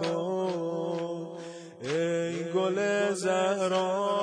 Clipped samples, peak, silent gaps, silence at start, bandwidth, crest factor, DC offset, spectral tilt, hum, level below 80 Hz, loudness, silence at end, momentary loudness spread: under 0.1%; -14 dBFS; none; 0 s; 10.5 kHz; 14 dB; under 0.1%; -5 dB/octave; none; -76 dBFS; -29 LUFS; 0 s; 11 LU